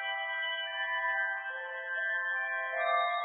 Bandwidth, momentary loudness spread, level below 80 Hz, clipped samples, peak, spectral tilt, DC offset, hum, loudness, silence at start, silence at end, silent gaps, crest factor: 4 kHz; 6 LU; under -90 dBFS; under 0.1%; -16 dBFS; 12 dB/octave; under 0.1%; none; -32 LUFS; 0 s; 0 s; none; 16 dB